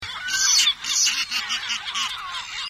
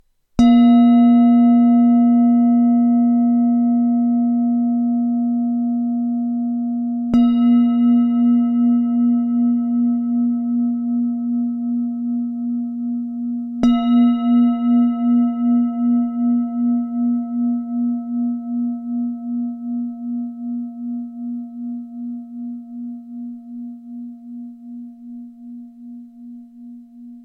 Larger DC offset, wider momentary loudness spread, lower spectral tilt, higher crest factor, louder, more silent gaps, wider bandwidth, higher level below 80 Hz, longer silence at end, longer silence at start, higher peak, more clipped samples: neither; second, 10 LU vs 20 LU; second, 3.5 dB/octave vs -8 dB/octave; first, 20 dB vs 14 dB; second, -20 LUFS vs -17 LUFS; neither; first, 16 kHz vs 4 kHz; second, -58 dBFS vs -52 dBFS; about the same, 0 s vs 0 s; second, 0 s vs 0.4 s; about the same, -4 dBFS vs -4 dBFS; neither